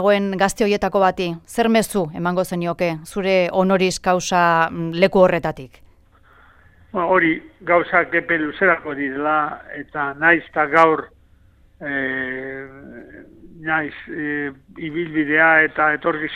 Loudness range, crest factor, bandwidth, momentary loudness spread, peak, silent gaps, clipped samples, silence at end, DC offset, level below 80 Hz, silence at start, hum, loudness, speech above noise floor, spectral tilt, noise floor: 8 LU; 20 dB; 16 kHz; 14 LU; 0 dBFS; none; under 0.1%; 0 s; under 0.1%; -50 dBFS; 0 s; none; -19 LUFS; 33 dB; -5 dB/octave; -52 dBFS